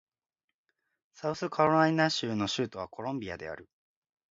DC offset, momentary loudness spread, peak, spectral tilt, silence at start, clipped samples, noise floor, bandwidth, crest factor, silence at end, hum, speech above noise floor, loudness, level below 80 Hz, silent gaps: under 0.1%; 15 LU; -10 dBFS; -5 dB/octave; 1.15 s; under 0.1%; -82 dBFS; 7.8 kHz; 22 dB; 0.65 s; none; 52 dB; -30 LUFS; -66 dBFS; none